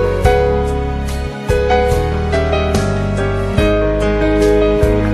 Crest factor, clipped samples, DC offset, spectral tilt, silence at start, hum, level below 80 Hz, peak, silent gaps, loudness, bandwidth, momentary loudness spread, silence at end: 14 dB; under 0.1%; under 0.1%; -6.5 dB/octave; 0 s; none; -20 dBFS; 0 dBFS; none; -15 LUFS; 13 kHz; 6 LU; 0 s